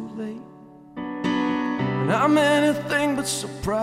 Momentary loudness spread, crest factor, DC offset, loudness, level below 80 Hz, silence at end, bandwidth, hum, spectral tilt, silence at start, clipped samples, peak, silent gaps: 16 LU; 16 dB; under 0.1%; -22 LUFS; -52 dBFS; 0 s; 15 kHz; none; -5 dB/octave; 0 s; under 0.1%; -8 dBFS; none